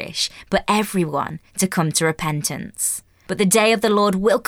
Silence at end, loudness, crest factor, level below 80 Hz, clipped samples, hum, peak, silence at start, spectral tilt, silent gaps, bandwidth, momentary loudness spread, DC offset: 0.05 s; -20 LUFS; 16 dB; -50 dBFS; under 0.1%; none; -4 dBFS; 0 s; -4 dB/octave; none; 18.5 kHz; 10 LU; under 0.1%